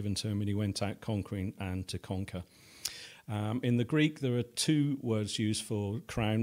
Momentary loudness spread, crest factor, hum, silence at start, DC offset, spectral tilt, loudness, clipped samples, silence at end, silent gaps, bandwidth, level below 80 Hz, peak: 10 LU; 20 dB; none; 0 s; under 0.1%; -5.5 dB/octave; -33 LUFS; under 0.1%; 0 s; none; 16 kHz; -58 dBFS; -12 dBFS